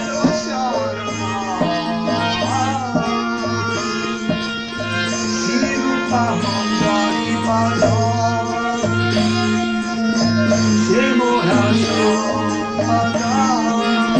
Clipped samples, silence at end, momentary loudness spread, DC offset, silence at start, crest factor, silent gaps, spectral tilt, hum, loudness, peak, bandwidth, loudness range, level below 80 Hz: under 0.1%; 0 s; 6 LU; 0.2%; 0 s; 14 dB; none; -5 dB/octave; none; -18 LUFS; -4 dBFS; 9.6 kHz; 4 LU; -46 dBFS